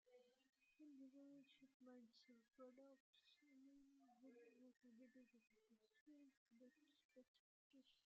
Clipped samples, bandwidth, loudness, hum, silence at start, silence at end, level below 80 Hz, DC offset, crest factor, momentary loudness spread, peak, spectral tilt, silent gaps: under 0.1%; 7 kHz; -68 LUFS; none; 0.05 s; 0 s; under -90 dBFS; under 0.1%; 18 dB; 3 LU; -54 dBFS; -3 dB/octave; 1.74-1.80 s, 3.00-3.13 s, 6.01-6.06 s, 6.37-6.46 s, 7.04-7.09 s, 7.28-7.70 s